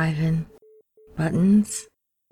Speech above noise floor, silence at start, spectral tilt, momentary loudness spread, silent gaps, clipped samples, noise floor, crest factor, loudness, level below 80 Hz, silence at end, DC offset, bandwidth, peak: 33 dB; 0 s; -6.5 dB/octave; 18 LU; none; under 0.1%; -54 dBFS; 14 dB; -23 LUFS; -50 dBFS; 0.5 s; under 0.1%; 14 kHz; -10 dBFS